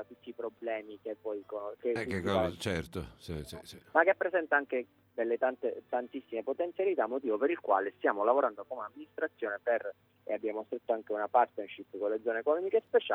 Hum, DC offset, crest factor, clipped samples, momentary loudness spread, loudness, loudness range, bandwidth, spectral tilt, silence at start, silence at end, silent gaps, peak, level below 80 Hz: none; under 0.1%; 22 dB; under 0.1%; 14 LU; -33 LUFS; 3 LU; 14.5 kHz; -6 dB/octave; 0 s; 0 s; none; -12 dBFS; -62 dBFS